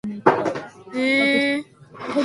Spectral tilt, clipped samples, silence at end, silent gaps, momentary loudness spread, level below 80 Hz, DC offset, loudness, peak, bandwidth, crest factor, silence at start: -5 dB/octave; under 0.1%; 0 s; none; 15 LU; -64 dBFS; under 0.1%; -20 LUFS; 0 dBFS; 11.5 kHz; 22 dB; 0.05 s